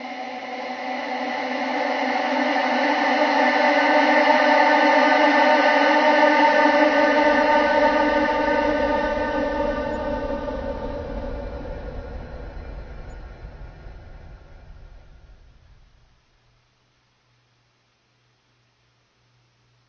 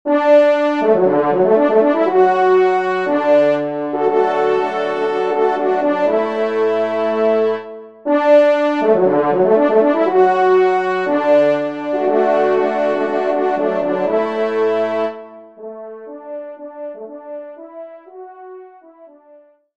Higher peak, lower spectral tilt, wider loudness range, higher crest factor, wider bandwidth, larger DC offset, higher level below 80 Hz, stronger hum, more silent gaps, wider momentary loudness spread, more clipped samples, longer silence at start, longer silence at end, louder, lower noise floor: about the same, -2 dBFS vs -2 dBFS; second, -4.5 dB/octave vs -7 dB/octave; about the same, 19 LU vs 17 LU; about the same, 18 dB vs 14 dB; second, 6.8 kHz vs 7.8 kHz; second, under 0.1% vs 0.3%; first, -42 dBFS vs -68 dBFS; neither; neither; about the same, 20 LU vs 19 LU; neither; about the same, 0 s vs 0.05 s; first, 4.9 s vs 0.7 s; second, -19 LUFS vs -15 LUFS; first, -65 dBFS vs -48 dBFS